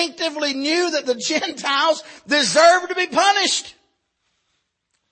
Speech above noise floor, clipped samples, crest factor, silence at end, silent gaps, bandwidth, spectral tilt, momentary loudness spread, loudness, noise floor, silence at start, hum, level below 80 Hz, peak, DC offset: 53 dB; under 0.1%; 18 dB; 1.4 s; none; 8.8 kHz; -1 dB/octave; 9 LU; -18 LUFS; -72 dBFS; 0 s; none; -70 dBFS; -2 dBFS; under 0.1%